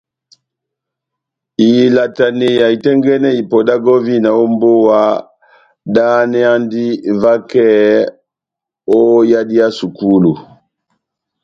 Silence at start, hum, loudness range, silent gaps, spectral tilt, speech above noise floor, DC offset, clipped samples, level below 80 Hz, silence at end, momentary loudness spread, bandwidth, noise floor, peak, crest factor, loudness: 1.6 s; none; 2 LU; none; -7.5 dB/octave; 74 dB; under 0.1%; under 0.1%; -56 dBFS; 1.05 s; 7 LU; 7.4 kHz; -84 dBFS; 0 dBFS; 12 dB; -11 LUFS